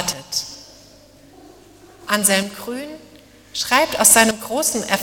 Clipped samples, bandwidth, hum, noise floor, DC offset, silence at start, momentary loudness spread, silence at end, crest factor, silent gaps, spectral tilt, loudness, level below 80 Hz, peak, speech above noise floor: under 0.1%; 19 kHz; none; -47 dBFS; under 0.1%; 0 s; 22 LU; 0 s; 20 dB; none; -1.5 dB/octave; -16 LUFS; -54 dBFS; 0 dBFS; 29 dB